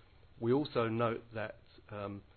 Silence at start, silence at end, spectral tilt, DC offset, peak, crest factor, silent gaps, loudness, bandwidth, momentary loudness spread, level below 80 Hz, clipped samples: 0.35 s; 0.15 s; -6 dB/octave; under 0.1%; -20 dBFS; 18 dB; none; -36 LUFS; 4.5 kHz; 12 LU; -64 dBFS; under 0.1%